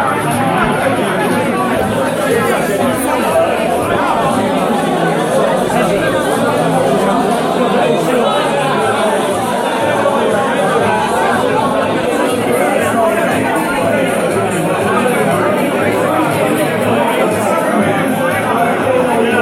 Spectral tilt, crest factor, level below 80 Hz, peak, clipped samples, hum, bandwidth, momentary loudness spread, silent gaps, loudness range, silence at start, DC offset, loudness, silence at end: -5 dB/octave; 12 dB; -44 dBFS; -2 dBFS; under 0.1%; none; 16.5 kHz; 2 LU; none; 1 LU; 0 s; under 0.1%; -13 LUFS; 0 s